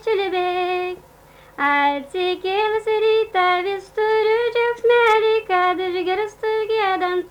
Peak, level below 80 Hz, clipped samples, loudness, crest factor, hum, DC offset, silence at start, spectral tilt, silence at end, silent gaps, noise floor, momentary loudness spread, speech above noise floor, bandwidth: -6 dBFS; -56 dBFS; under 0.1%; -19 LUFS; 14 dB; none; under 0.1%; 0.05 s; -4 dB/octave; 0 s; none; -48 dBFS; 7 LU; 28 dB; 11 kHz